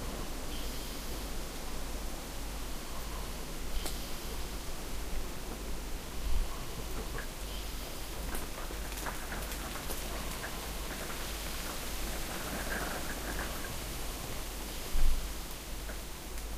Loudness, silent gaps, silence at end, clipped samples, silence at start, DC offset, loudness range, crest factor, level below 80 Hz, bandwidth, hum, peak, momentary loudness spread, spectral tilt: -40 LUFS; none; 0 s; under 0.1%; 0 s; under 0.1%; 3 LU; 22 dB; -38 dBFS; 15.5 kHz; none; -14 dBFS; 5 LU; -3 dB/octave